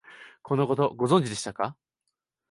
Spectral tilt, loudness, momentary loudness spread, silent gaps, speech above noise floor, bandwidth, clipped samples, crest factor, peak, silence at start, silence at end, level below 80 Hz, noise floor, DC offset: -6 dB/octave; -26 LUFS; 10 LU; none; 57 dB; 11.5 kHz; under 0.1%; 18 dB; -10 dBFS; 0.1 s; 0.8 s; -64 dBFS; -82 dBFS; under 0.1%